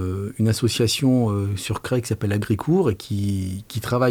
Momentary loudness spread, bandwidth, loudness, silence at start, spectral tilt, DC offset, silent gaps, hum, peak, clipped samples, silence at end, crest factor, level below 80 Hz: 8 LU; 19.5 kHz; -22 LUFS; 0 s; -6 dB/octave; under 0.1%; none; none; -6 dBFS; under 0.1%; 0 s; 14 dB; -52 dBFS